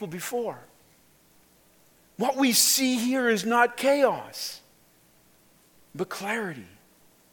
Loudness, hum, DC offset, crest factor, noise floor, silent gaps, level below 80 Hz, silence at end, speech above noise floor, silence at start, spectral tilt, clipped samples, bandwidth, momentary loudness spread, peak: -25 LUFS; none; under 0.1%; 22 dB; -60 dBFS; none; -74 dBFS; 0.65 s; 35 dB; 0 s; -2 dB/octave; under 0.1%; 17.5 kHz; 17 LU; -6 dBFS